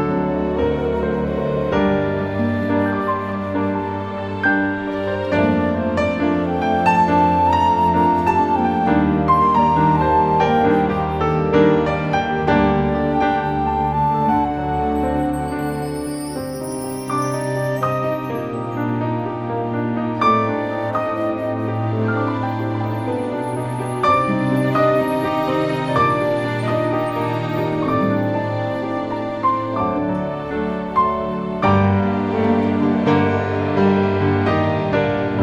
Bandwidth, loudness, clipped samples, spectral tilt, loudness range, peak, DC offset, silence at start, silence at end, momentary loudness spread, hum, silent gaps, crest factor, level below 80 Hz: 17 kHz; -19 LUFS; under 0.1%; -7.5 dB/octave; 6 LU; -2 dBFS; under 0.1%; 0 s; 0 s; 8 LU; none; none; 16 dB; -40 dBFS